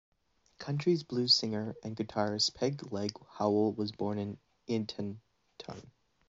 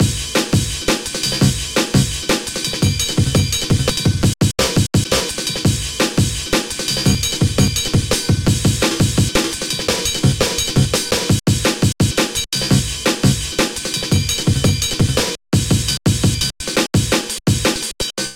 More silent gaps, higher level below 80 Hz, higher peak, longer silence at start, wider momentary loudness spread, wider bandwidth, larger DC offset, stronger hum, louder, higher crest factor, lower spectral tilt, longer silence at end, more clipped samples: neither; second, -70 dBFS vs -30 dBFS; second, -14 dBFS vs -2 dBFS; first, 0.6 s vs 0 s; first, 20 LU vs 3 LU; second, 7.6 kHz vs 17 kHz; neither; neither; second, -32 LUFS vs -17 LUFS; about the same, 20 dB vs 16 dB; about the same, -4.5 dB/octave vs -4 dB/octave; first, 0.4 s vs 0 s; neither